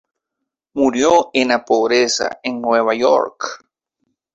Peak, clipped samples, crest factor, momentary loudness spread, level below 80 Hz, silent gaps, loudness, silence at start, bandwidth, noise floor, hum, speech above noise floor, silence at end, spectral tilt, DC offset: 0 dBFS; under 0.1%; 18 dB; 10 LU; -58 dBFS; none; -16 LUFS; 0.75 s; 8.4 kHz; -80 dBFS; none; 64 dB; 0.8 s; -2.5 dB/octave; under 0.1%